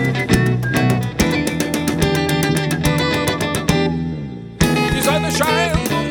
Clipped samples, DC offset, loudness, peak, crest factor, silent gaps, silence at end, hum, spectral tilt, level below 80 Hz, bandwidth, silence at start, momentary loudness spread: under 0.1%; under 0.1%; -17 LUFS; -2 dBFS; 16 dB; none; 0 s; none; -5 dB/octave; -32 dBFS; 20 kHz; 0 s; 4 LU